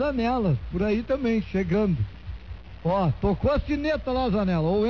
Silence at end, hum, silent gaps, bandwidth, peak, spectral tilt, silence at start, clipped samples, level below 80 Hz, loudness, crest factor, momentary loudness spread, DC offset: 0 s; none; none; 6.6 kHz; -12 dBFS; -9 dB/octave; 0 s; under 0.1%; -38 dBFS; -25 LUFS; 12 dB; 9 LU; 0.4%